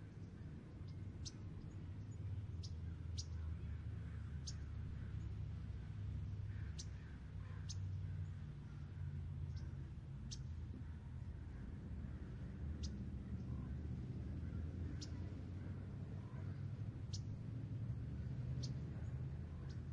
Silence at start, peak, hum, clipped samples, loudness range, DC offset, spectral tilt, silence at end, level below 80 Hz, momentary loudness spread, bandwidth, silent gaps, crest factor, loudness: 0 s; -32 dBFS; none; under 0.1%; 3 LU; under 0.1%; -6.5 dB/octave; 0 s; -54 dBFS; 5 LU; 9 kHz; none; 16 dB; -49 LUFS